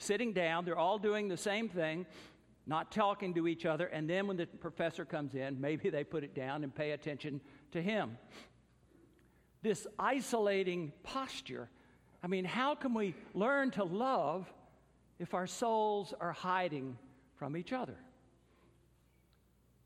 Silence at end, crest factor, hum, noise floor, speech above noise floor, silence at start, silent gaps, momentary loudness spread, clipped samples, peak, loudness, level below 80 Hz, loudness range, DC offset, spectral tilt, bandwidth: 1.75 s; 20 dB; none; -70 dBFS; 33 dB; 0 s; none; 13 LU; under 0.1%; -18 dBFS; -37 LUFS; -74 dBFS; 5 LU; under 0.1%; -5 dB/octave; 15 kHz